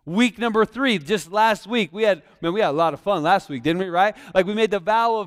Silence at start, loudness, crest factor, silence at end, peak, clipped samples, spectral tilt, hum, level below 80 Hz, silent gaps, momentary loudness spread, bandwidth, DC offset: 0.05 s; -21 LUFS; 16 dB; 0 s; -4 dBFS; under 0.1%; -5 dB/octave; none; -58 dBFS; none; 4 LU; 15.5 kHz; under 0.1%